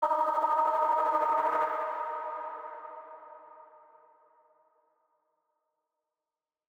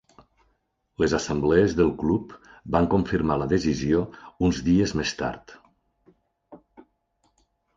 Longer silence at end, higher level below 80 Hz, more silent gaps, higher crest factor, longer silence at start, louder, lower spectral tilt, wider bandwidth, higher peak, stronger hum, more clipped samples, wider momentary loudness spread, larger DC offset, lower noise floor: first, 3.05 s vs 1.2 s; second, under -90 dBFS vs -44 dBFS; neither; about the same, 18 dB vs 20 dB; second, 0 s vs 1 s; second, -29 LUFS vs -24 LUFS; second, -3.5 dB/octave vs -6 dB/octave; first, over 20 kHz vs 7.8 kHz; second, -16 dBFS vs -6 dBFS; neither; neither; first, 21 LU vs 12 LU; neither; first, under -90 dBFS vs -72 dBFS